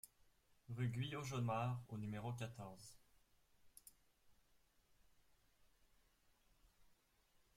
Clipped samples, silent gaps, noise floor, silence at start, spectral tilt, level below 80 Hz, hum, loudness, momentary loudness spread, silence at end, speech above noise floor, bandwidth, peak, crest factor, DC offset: under 0.1%; none; -77 dBFS; 0.05 s; -6 dB/octave; -76 dBFS; none; -46 LUFS; 21 LU; 0.65 s; 32 dB; 16 kHz; -30 dBFS; 20 dB; under 0.1%